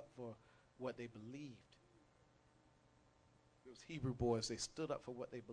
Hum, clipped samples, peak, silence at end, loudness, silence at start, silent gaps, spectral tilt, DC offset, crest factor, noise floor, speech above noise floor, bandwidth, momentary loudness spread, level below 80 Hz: none; under 0.1%; -26 dBFS; 0 s; -46 LUFS; 0 s; none; -5 dB/octave; under 0.1%; 22 dB; -73 dBFS; 27 dB; 10 kHz; 22 LU; -68 dBFS